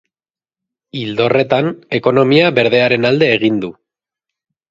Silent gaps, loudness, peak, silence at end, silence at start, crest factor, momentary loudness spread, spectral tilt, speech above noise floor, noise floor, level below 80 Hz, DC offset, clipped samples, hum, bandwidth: none; -13 LUFS; 0 dBFS; 1 s; 0.95 s; 16 dB; 11 LU; -7 dB/octave; over 77 dB; under -90 dBFS; -56 dBFS; under 0.1%; under 0.1%; none; 7.6 kHz